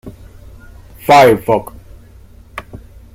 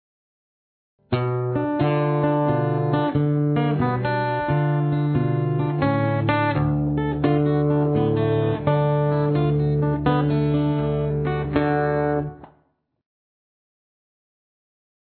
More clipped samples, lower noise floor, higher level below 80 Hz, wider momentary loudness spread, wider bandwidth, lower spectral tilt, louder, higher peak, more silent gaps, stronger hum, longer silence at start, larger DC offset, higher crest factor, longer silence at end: neither; second, -40 dBFS vs -66 dBFS; about the same, -40 dBFS vs -44 dBFS; first, 24 LU vs 3 LU; first, 16.5 kHz vs 4.5 kHz; second, -5 dB/octave vs -12 dB/octave; first, -11 LUFS vs -22 LUFS; first, 0 dBFS vs -6 dBFS; neither; neither; second, 0.05 s vs 1.1 s; neither; about the same, 16 dB vs 16 dB; second, 0.4 s vs 2.75 s